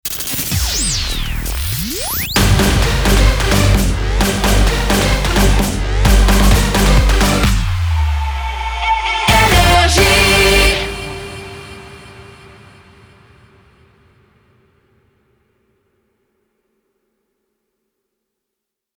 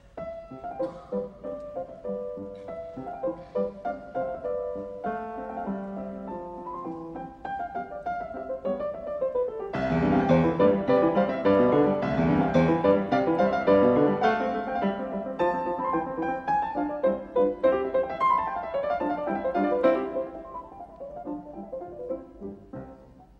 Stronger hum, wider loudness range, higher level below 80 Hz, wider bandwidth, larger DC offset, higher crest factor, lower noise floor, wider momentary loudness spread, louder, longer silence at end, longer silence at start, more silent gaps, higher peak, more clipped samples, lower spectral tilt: neither; second, 4 LU vs 12 LU; first, -18 dBFS vs -52 dBFS; first, over 20 kHz vs 6.4 kHz; neither; second, 14 dB vs 20 dB; first, -80 dBFS vs -50 dBFS; second, 12 LU vs 17 LU; first, -13 LUFS vs -27 LUFS; first, 6.75 s vs 0.15 s; about the same, 0.05 s vs 0.15 s; neither; first, 0 dBFS vs -8 dBFS; neither; second, -4 dB/octave vs -8.5 dB/octave